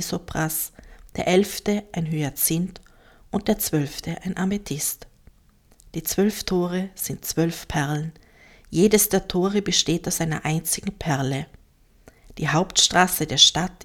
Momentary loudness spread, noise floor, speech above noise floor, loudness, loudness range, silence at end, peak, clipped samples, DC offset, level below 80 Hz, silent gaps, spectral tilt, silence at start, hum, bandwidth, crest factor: 13 LU; -56 dBFS; 33 dB; -22 LUFS; 5 LU; 0 s; 0 dBFS; under 0.1%; under 0.1%; -46 dBFS; none; -3.5 dB/octave; 0 s; none; 19 kHz; 24 dB